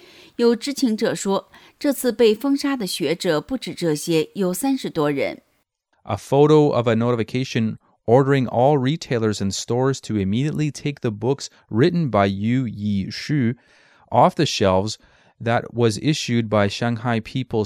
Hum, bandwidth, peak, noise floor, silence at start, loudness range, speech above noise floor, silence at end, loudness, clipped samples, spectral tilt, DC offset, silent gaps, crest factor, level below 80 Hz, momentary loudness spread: none; 19 kHz; -2 dBFS; -68 dBFS; 0.4 s; 3 LU; 48 dB; 0 s; -21 LUFS; under 0.1%; -6 dB/octave; under 0.1%; none; 18 dB; -58 dBFS; 8 LU